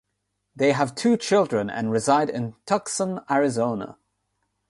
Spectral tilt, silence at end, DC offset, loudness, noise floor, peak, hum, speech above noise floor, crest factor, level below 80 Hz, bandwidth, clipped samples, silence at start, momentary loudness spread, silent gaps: -5 dB/octave; 0.75 s; under 0.1%; -23 LUFS; -77 dBFS; -6 dBFS; none; 54 dB; 18 dB; -64 dBFS; 11.5 kHz; under 0.1%; 0.55 s; 7 LU; none